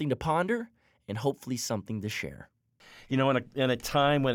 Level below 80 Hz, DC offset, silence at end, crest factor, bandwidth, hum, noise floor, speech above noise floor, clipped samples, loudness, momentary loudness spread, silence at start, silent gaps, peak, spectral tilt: -58 dBFS; under 0.1%; 0 s; 16 dB; 18 kHz; none; -56 dBFS; 27 dB; under 0.1%; -30 LUFS; 10 LU; 0 s; none; -14 dBFS; -5 dB/octave